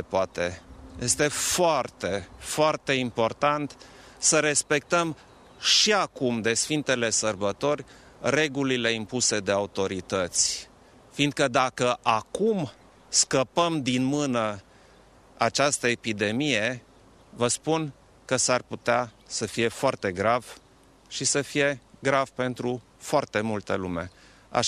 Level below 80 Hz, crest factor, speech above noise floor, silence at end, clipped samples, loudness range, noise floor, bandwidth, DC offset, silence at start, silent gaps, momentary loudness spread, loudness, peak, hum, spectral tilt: -58 dBFS; 20 dB; 30 dB; 0 s; under 0.1%; 4 LU; -56 dBFS; 14.5 kHz; under 0.1%; 0 s; none; 10 LU; -25 LUFS; -8 dBFS; none; -3 dB/octave